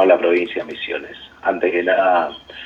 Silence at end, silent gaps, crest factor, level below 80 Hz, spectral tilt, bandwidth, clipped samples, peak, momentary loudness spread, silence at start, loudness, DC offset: 0 s; none; 16 dB; -58 dBFS; -6 dB/octave; 7 kHz; under 0.1%; -2 dBFS; 11 LU; 0 s; -19 LUFS; under 0.1%